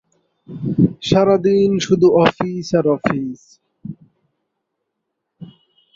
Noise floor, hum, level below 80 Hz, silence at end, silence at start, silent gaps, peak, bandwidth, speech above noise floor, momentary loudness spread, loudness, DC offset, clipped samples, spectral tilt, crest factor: -76 dBFS; none; -50 dBFS; 0.5 s; 0.5 s; none; -2 dBFS; 7.6 kHz; 61 dB; 22 LU; -16 LUFS; under 0.1%; under 0.1%; -6.5 dB/octave; 18 dB